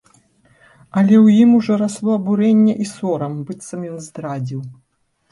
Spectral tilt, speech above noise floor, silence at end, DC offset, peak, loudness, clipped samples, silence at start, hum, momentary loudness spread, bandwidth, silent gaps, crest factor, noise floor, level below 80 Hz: -7.5 dB/octave; 39 dB; 0.6 s; under 0.1%; -4 dBFS; -16 LUFS; under 0.1%; 0.95 s; none; 18 LU; 11.5 kHz; none; 14 dB; -55 dBFS; -62 dBFS